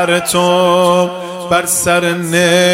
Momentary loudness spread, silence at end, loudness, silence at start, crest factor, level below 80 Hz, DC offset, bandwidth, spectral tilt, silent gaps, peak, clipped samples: 5 LU; 0 s; -12 LUFS; 0 s; 12 dB; -50 dBFS; under 0.1%; 16 kHz; -3.5 dB/octave; none; 0 dBFS; under 0.1%